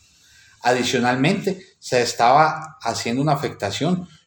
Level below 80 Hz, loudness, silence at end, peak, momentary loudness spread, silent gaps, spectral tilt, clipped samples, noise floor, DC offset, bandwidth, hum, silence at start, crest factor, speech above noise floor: -60 dBFS; -20 LUFS; 0.2 s; -2 dBFS; 10 LU; none; -4.5 dB/octave; under 0.1%; -53 dBFS; under 0.1%; 19 kHz; none; 0.65 s; 18 dB; 32 dB